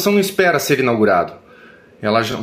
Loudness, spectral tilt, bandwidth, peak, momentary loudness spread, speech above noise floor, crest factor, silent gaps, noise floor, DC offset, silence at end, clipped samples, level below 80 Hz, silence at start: -16 LUFS; -4.5 dB/octave; 16 kHz; -2 dBFS; 7 LU; 28 dB; 16 dB; none; -44 dBFS; under 0.1%; 0 s; under 0.1%; -56 dBFS; 0 s